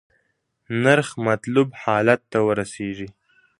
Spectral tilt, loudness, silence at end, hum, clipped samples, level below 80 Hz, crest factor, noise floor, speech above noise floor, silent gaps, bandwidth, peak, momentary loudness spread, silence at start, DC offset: -6 dB/octave; -21 LUFS; 0.5 s; none; under 0.1%; -58 dBFS; 22 dB; -71 dBFS; 50 dB; none; 11.5 kHz; 0 dBFS; 12 LU; 0.7 s; under 0.1%